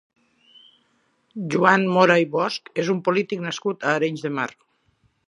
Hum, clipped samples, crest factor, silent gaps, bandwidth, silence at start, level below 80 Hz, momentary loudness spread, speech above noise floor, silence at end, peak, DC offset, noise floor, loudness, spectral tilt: none; under 0.1%; 22 dB; none; 11 kHz; 1.35 s; -72 dBFS; 11 LU; 45 dB; 0.8 s; 0 dBFS; under 0.1%; -66 dBFS; -21 LUFS; -5.5 dB/octave